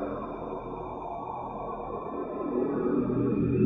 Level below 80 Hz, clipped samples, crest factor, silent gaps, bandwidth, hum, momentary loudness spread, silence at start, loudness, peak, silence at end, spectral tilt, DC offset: -52 dBFS; under 0.1%; 18 dB; none; 3.9 kHz; none; 9 LU; 0 s; -32 LUFS; -12 dBFS; 0 s; -11.5 dB/octave; under 0.1%